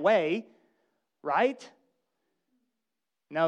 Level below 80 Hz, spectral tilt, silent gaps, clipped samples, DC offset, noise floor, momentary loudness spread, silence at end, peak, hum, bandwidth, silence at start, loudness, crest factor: -88 dBFS; -5.5 dB/octave; none; under 0.1%; under 0.1%; -88 dBFS; 14 LU; 0 s; -12 dBFS; none; 9.4 kHz; 0 s; -29 LUFS; 20 dB